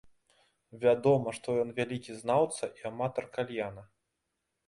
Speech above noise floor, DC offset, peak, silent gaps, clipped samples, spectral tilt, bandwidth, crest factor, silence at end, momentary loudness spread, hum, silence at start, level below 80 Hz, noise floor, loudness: 53 dB; under 0.1%; -14 dBFS; none; under 0.1%; -6 dB/octave; 11.5 kHz; 20 dB; 0.85 s; 11 LU; none; 0.75 s; -68 dBFS; -83 dBFS; -31 LUFS